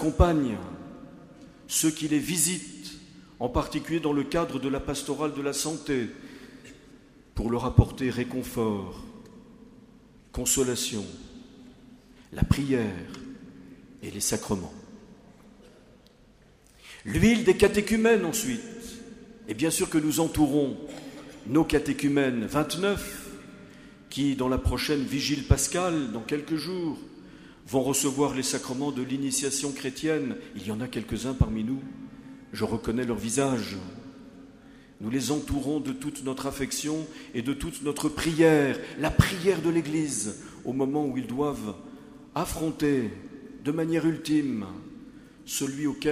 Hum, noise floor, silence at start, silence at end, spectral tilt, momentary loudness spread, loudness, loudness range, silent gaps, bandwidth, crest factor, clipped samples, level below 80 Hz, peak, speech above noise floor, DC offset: none; -57 dBFS; 0 s; 0 s; -4.5 dB/octave; 21 LU; -27 LUFS; 6 LU; none; 15.5 kHz; 24 dB; under 0.1%; -42 dBFS; -4 dBFS; 30 dB; under 0.1%